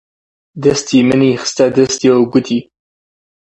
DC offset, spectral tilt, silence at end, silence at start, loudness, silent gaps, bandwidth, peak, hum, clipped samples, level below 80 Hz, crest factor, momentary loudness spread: under 0.1%; -5 dB/octave; 0.8 s; 0.55 s; -13 LUFS; none; 8.4 kHz; 0 dBFS; none; under 0.1%; -50 dBFS; 14 dB; 5 LU